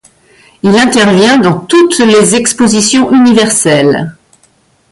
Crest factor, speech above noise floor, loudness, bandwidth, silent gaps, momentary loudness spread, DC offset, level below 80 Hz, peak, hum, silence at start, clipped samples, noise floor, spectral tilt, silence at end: 8 dB; 43 dB; -7 LUFS; 11.5 kHz; none; 4 LU; under 0.1%; -46 dBFS; 0 dBFS; none; 0.65 s; under 0.1%; -50 dBFS; -4 dB/octave; 0.8 s